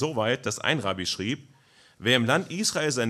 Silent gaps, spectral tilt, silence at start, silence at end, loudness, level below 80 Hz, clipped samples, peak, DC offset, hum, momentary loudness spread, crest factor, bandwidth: none; -3.5 dB/octave; 0 s; 0 s; -26 LUFS; -68 dBFS; under 0.1%; -6 dBFS; under 0.1%; none; 8 LU; 20 dB; 14.5 kHz